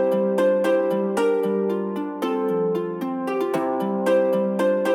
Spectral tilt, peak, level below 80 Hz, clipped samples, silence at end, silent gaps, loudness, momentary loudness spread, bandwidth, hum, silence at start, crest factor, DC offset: -7 dB/octave; -10 dBFS; -76 dBFS; under 0.1%; 0 s; none; -22 LUFS; 6 LU; 16.5 kHz; none; 0 s; 12 dB; under 0.1%